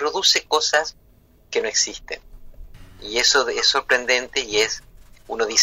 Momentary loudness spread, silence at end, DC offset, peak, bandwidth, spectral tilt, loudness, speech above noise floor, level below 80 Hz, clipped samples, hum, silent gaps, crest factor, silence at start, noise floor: 16 LU; 0 s; under 0.1%; -4 dBFS; 16 kHz; 0.5 dB/octave; -19 LUFS; 26 dB; -48 dBFS; under 0.1%; none; none; 18 dB; 0 s; -46 dBFS